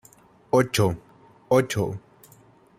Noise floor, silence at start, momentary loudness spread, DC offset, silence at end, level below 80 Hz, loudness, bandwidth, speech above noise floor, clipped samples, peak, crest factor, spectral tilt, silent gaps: -54 dBFS; 0.55 s; 13 LU; under 0.1%; 0.8 s; -56 dBFS; -23 LUFS; 16 kHz; 33 dB; under 0.1%; -6 dBFS; 20 dB; -5.5 dB/octave; none